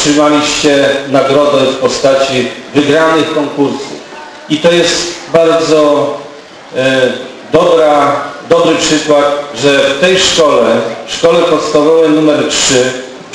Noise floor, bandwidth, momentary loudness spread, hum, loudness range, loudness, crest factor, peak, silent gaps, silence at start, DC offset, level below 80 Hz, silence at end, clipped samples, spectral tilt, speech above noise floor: -30 dBFS; 11 kHz; 9 LU; none; 3 LU; -9 LUFS; 10 dB; 0 dBFS; none; 0 s; under 0.1%; -44 dBFS; 0 s; 0.3%; -3.5 dB/octave; 21 dB